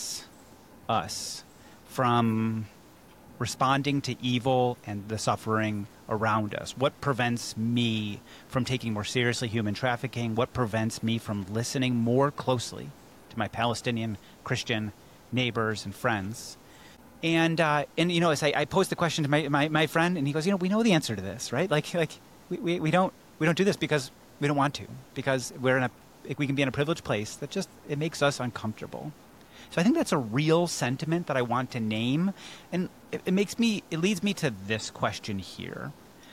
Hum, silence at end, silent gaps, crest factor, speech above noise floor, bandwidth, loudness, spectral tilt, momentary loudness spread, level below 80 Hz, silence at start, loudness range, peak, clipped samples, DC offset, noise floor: none; 0 s; none; 16 dB; 25 dB; 17 kHz; -28 LUFS; -5 dB/octave; 12 LU; -60 dBFS; 0 s; 4 LU; -12 dBFS; under 0.1%; under 0.1%; -53 dBFS